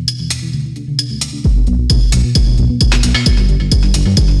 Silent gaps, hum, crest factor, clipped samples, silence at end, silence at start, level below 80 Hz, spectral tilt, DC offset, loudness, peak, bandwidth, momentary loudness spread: none; none; 10 dB; under 0.1%; 0 s; 0 s; -14 dBFS; -5 dB/octave; under 0.1%; -14 LUFS; -2 dBFS; 12 kHz; 7 LU